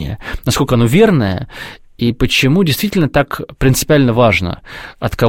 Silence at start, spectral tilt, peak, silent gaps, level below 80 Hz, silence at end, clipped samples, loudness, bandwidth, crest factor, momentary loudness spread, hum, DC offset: 0 s; -5.5 dB/octave; 0 dBFS; none; -30 dBFS; 0 s; under 0.1%; -13 LUFS; 16.5 kHz; 14 dB; 14 LU; none; 0.8%